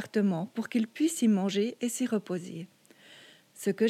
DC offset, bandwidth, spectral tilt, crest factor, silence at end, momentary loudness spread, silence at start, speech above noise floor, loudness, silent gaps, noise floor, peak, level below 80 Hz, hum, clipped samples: under 0.1%; 15 kHz; -5.5 dB/octave; 14 dB; 0 s; 12 LU; 0 s; 26 dB; -30 LUFS; none; -55 dBFS; -16 dBFS; -86 dBFS; none; under 0.1%